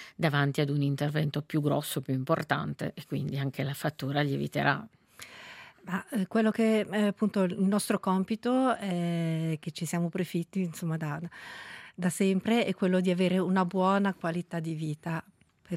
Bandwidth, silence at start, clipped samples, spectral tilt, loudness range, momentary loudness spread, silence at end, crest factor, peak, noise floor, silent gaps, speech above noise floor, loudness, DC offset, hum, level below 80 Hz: 16 kHz; 0 s; under 0.1%; -6 dB/octave; 5 LU; 10 LU; 0 s; 20 dB; -8 dBFS; -49 dBFS; none; 20 dB; -30 LUFS; under 0.1%; none; -70 dBFS